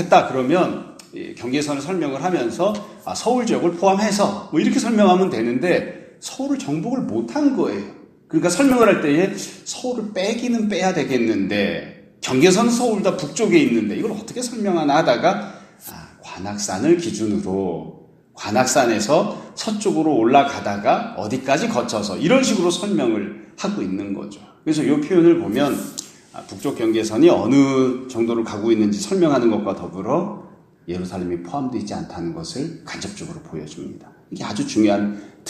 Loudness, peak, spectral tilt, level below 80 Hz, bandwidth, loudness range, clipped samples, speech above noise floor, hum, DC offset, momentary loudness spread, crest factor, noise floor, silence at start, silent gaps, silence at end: -19 LUFS; 0 dBFS; -5 dB/octave; -58 dBFS; 15 kHz; 6 LU; under 0.1%; 20 dB; none; under 0.1%; 17 LU; 20 dB; -39 dBFS; 0 s; none; 0 s